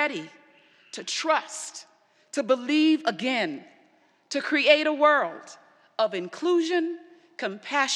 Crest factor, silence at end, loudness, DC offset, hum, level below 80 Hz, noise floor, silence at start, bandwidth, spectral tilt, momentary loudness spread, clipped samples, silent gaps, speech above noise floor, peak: 24 dB; 0 s; -25 LUFS; under 0.1%; none; under -90 dBFS; -62 dBFS; 0 s; 11.5 kHz; -2.5 dB/octave; 20 LU; under 0.1%; none; 37 dB; -4 dBFS